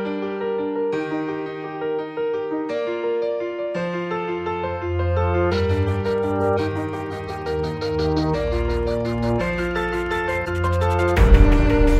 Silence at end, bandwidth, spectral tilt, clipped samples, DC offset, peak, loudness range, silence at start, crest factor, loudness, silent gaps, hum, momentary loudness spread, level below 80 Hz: 0 s; 11 kHz; -7.5 dB/octave; under 0.1%; under 0.1%; 0 dBFS; 5 LU; 0 s; 20 dB; -22 LUFS; none; none; 8 LU; -26 dBFS